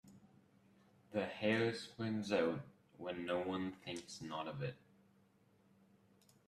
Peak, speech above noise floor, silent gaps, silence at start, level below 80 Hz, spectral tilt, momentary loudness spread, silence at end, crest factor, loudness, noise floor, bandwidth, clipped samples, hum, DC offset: -22 dBFS; 32 dB; none; 0.05 s; -78 dBFS; -5.5 dB/octave; 11 LU; 1.7 s; 22 dB; -41 LUFS; -72 dBFS; 13.5 kHz; under 0.1%; none; under 0.1%